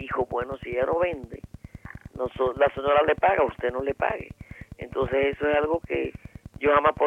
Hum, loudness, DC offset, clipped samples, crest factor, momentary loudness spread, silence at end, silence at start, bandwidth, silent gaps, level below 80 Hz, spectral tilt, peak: none; -25 LUFS; under 0.1%; under 0.1%; 18 dB; 22 LU; 0 s; 0 s; 7.4 kHz; none; -48 dBFS; -7.5 dB/octave; -8 dBFS